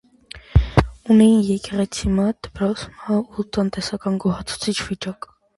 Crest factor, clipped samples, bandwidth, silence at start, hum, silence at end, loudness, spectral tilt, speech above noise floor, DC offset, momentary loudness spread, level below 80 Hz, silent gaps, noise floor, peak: 20 dB; under 0.1%; 11.5 kHz; 0.35 s; none; 0.45 s; -20 LUFS; -6 dB/octave; 23 dB; under 0.1%; 14 LU; -30 dBFS; none; -43 dBFS; 0 dBFS